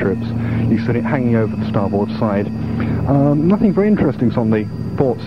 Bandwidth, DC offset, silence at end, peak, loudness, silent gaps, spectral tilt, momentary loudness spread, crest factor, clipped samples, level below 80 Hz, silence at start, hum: 6 kHz; 0.9%; 0 s; 0 dBFS; -17 LUFS; none; -10 dB/octave; 6 LU; 16 dB; under 0.1%; -40 dBFS; 0 s; none